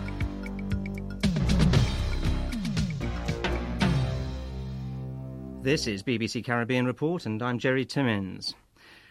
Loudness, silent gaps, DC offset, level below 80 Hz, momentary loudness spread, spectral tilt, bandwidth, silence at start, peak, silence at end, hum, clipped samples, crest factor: -29 LUFS; none; under 0.1%; -36 dBFS; 11 LU; -6 dB/octave; 14 kHz; 0 s; -10 dBFS; 0.15 s; none; under 0.1%; 18 dB